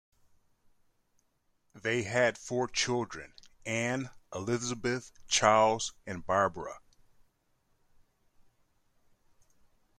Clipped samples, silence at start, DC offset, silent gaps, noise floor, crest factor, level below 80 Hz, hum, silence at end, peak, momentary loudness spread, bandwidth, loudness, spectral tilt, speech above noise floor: under 0.1%; 1.75 s; under 0.1%; none; -74 dBFS; 26 dB; -64 dBFS; none; 3.2 s; -8 dBFS; 16 LU; 13.5 kHz; -30 LUFS; -3.5 dB/octave; 43 dB